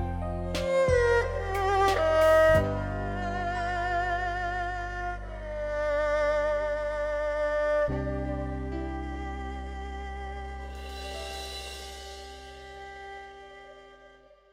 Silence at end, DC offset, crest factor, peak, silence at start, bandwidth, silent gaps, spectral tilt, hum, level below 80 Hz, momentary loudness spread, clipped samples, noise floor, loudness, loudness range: 0.45 s; under 0.1%; 18 dB; -12 dBFS; 0 s; 16.5 kHz; none; -5.5 dB/octave; none; -40 dBFS; 19 LU; under 0.1%; -55 dBFS; -28 LUFS; 15 LU